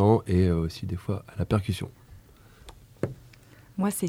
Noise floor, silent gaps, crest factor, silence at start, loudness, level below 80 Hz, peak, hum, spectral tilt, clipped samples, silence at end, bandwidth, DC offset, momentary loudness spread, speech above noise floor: -53 dBFS; none; 20 dB; 0 s; -28 LUFS; -46 dBFS; -8 dBFS; none; -7 dB/octave; under 0.1%; 0 s; 16 kHz; under 0.1%; 15 LU; 27 dB